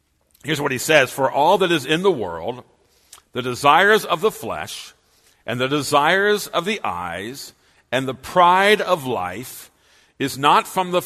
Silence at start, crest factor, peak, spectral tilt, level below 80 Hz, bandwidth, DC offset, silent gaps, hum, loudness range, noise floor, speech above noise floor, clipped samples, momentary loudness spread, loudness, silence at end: 0.45 s; 20 dB; 0 dBFS; -3.5 dB/octave; -58 dBFS; 13.5 kHz; under 0.1%; none; none; 3 LU; -58 dBFS; 39 dB; under 0.1%; 17 LU; -19 LUFS; 0 s